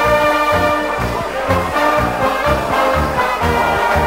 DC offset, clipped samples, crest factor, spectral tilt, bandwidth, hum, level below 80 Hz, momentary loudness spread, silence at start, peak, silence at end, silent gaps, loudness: under 0.1%; under 0.1%; 14 dB; -5 dB/octave; 16.5 kHz; none; -30 dBFS; 4 LU; 0 s; -2 dBFS; 0 s; none; -15 LUFS